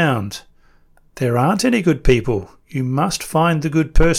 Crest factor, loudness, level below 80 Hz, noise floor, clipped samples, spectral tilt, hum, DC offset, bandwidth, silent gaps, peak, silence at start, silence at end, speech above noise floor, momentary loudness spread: 16 dB; -18 LUFS; -26 dBFS; -51 dBFS; under 0.1%; -5.5 dB/octave; none; under 0.1%; 15 kHz; none; -2 dBFS; 0 s; 0 s; 35 dB; 9 LU